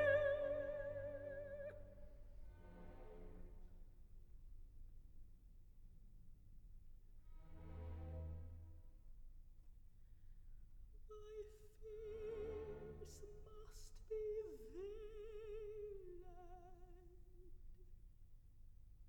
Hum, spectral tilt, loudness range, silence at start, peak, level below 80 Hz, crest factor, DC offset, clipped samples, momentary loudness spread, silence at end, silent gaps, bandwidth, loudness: none; -6 dB/octave; 13 LU; 0 s; -26 dBFS; -58 dBFS; 24 dB; under 0.1%; under 0.1%; 20 LU; 0 s; none; 19 kHz; -51 LUFS